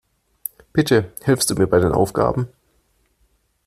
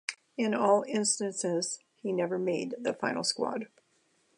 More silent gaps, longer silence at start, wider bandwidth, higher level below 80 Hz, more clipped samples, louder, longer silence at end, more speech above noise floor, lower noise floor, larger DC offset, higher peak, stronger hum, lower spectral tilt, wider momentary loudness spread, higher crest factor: neither; first, 0.75 s vs 0.1 s; first, 15.5 kHz vs 11.5 kHz; first, -44 dBFS vs -82 dBFS; neither; first, -19 LUFS vs -31 LUFS; first, 1.2 s vs 0.7 s; first, 46 dB vs 41 dB; second, -64 dBFS vs -71 dBFS; neither; first, -2 dBFS vs -12 dBFS; neither; first, -5 dB/octave vs -3.5 dB/octave; first, 15 LU vs 10 LU; about the same, 18 dB vs 20 dB